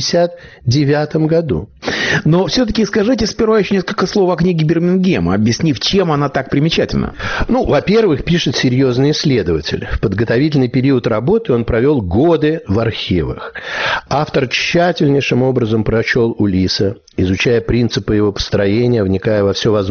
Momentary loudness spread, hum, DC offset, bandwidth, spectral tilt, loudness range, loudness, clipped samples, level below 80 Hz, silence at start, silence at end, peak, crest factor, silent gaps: 5 LU; none; under 0.1%; 6.8 kHz; -5 dB/octave; 1 LU; -14 LUFS; under 0.1%; -34 dBFS; 0 s; 0 s; -2 dBFS; 12 dB; none